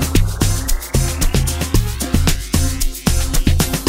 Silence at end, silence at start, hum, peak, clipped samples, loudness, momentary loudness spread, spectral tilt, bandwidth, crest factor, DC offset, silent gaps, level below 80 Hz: 0 s; 0 s; none; -2 dBFS; under 0.1%; -18 LUFS; 3 LU; -4.5 dB/octave; 16.5 kHz; 14 dB; under 0.1%; none; -18 dBFS